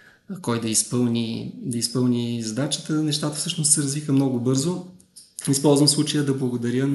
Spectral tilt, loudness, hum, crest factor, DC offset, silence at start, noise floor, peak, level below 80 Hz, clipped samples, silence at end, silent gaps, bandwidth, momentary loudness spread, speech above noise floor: -4.5 dB/octave; -22 LUFS; none; 20 dB; under 0.1%; 0.3 s; -42 dBFS; -4 dBFS; -66 dBFS; under 0.1%; 0 s; none; 12 kHz; 11 LU; 20 dB